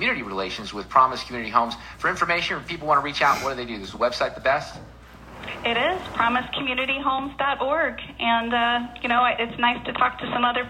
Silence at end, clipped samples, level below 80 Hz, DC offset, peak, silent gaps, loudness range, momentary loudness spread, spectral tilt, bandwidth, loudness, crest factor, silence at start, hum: 0 s; under 0.1%; -50 dBFS; under 0.1%; -4 dBFS; none; 2 LU; 8 LU; -4 dB/octave; 16 kHz; -23 LUFS; 20 dB; 0 s; none